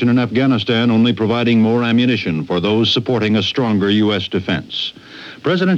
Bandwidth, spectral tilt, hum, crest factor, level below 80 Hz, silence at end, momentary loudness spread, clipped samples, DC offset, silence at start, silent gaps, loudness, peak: 7.4 kHz; -7 dB/octave; none; 10 dB; -54 dBFS; 0 s; 8 LU; under 0.1%; under 0.1%; 0 s; none; -16 LUFS; -4 dBFS